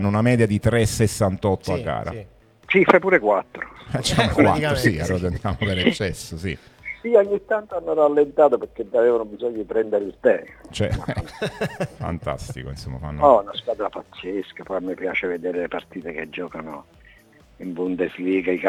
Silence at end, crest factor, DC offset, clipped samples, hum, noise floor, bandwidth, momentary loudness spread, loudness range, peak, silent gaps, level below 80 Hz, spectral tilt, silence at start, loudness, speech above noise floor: 0 s; 22 dB; under 0.1%; under 0.1%; none; -52 dBFS; 16 kHz; 15 LU; 9 LU; 0 dBFS; none; -44 dBFS; -6 dB/octave; 0 s; -22 LUFS; 30 dB